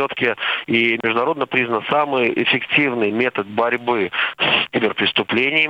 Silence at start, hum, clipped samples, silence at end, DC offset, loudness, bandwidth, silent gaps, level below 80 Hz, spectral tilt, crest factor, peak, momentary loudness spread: 0 s; none; under 0.1%; 0 s; under 0.1%; -18 LUFS; 7.6 kHz; none; -64 dBFS; -6.5 dB/octave; 16 dB; -2 dBFS; 4 LU